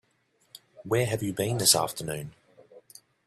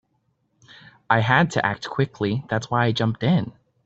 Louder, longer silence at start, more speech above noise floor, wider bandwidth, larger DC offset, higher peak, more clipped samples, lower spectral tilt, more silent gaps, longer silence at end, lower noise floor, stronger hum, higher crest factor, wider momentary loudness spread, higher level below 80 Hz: second, -26 LUFS vs -22 LUFS; second, 0.8 s vs 1.1 s; second, 43 dB vs 48 dB; first, 15.5 kHz vs 8 kHz; neither; second, -6 dBFS vs -2 dBFS; neither; second, -3 dB/octave vs -6.5 dB/octave; neither; first, 0.5 s vs 0.35 s; about the same, -69 dBFS vs -70 dBFS; neither; about the same, 24 dB vs 20 dB; first, 19 LU vs 7 LU; second, -62 dBFS vs -56 dBFS